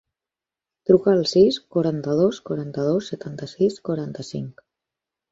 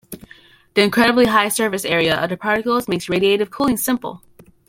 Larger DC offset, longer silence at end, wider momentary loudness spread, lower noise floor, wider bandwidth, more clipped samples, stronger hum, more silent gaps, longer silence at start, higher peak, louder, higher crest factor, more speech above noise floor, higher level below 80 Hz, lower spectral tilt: neither; first, 0.8 s vs 0.5 s; first, 15 LU vs 8 LU; first, -89 dBFS vs -48 dBFS; second, 7.8 kHz vs 16.5 kHz; neither; neither; neither; first, 0.9 s vs 0.1 s; about the same, -4 dBFS vs -2 dBFS; second, -21 LUFS vs -17 LUFS; about the same, 20 dB vs 18 dB; first, 68 dB vs 31 dB; second, -60 dBFS vs -50 dBFS; first, -7 dB/octave vs -4 dB/octave